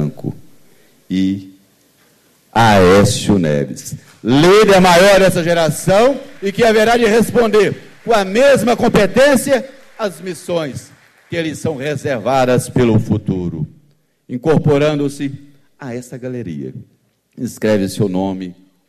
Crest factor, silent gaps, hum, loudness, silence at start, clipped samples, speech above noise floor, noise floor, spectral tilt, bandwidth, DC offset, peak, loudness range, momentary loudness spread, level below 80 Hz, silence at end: 12 dB; none; none; -13 LUFS; 0 s; under 0.1%; 42 dB; -56 dBFS; -5.5 dB/octave; 13.5 kHz; under 0.1%; -2 dBFS; 9 LU; 18 LU; -40 dBFS; 0.35 s